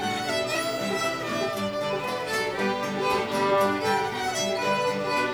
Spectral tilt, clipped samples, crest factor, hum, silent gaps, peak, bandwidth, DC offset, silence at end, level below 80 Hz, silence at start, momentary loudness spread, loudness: -3.5 dB/octave; under 0.1%; 16 dB; none; none; -12 dBFS; over 20 kHz; under 0.1%; 0 s; -58 dBFS; 0 s; 5 LU; -26 LUFS